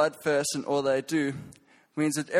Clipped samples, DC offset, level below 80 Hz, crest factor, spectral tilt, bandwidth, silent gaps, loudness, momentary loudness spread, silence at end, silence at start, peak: under 0.1%; under 0.1%; -70 dBFS; 18 dB; -4 dB/octave; 16 kHz; none; -28 LUFS; 9 LU; 0 s; 0 s; -10 dBFS